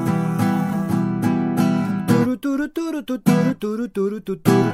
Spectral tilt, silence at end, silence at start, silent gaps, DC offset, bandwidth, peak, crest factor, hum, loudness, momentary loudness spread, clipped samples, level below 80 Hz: -7.5 dB/octave; 0 s; 0 s; none; under 0.1%; 16 kHz; 0 dBFS; 18 dB; none; -21 LUFS; 7 LU; under 0.1%; -54 dBFS